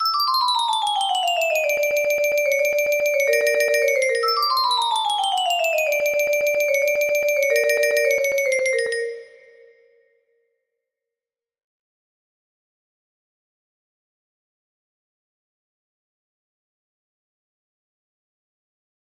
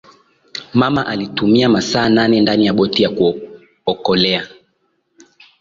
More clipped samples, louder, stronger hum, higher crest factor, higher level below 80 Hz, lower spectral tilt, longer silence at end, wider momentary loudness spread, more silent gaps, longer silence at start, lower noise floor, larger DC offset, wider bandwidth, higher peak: neither; second, -19 LUFS vs -15 LUFS; neither; about the same, 18 dB vs 14 dB; second, -70 dBFS vs -50 dBFS; second, 1.5 dB/octave vs -5.5 dB/octave; first, 9.75 s vs 1.15 s; second, 2 LU vs 11 LU; neither; second, 0 s vs 0.55 s; first, -89 dBFS vs -65 dBFS; neither; first, 15.5 kHz vs 7.6 kHz; about the same, -4 dBFS vs -2 dBFS